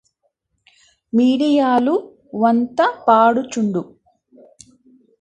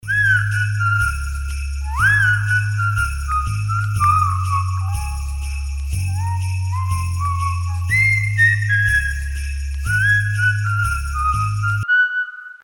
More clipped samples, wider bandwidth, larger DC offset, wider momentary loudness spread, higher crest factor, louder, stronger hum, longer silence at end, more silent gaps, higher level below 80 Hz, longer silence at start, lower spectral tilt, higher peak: neither; second, 9.4 kHz vs 18 kHz; neither; about the same, 10 LU vs 11 LU; about the same, 18 dB vs 14 dB; about the same, -17 LUFS vs -18 LUFS; neither; first, 1.35 s vs 0.1 s; neither; second, -64 dBFS vs -28 dBFS; first, 1.15 s vs 0.05 s; first, -6 dB/octave vs -3.5 dB/octave; first, 0 dBFS vs -4 dBFS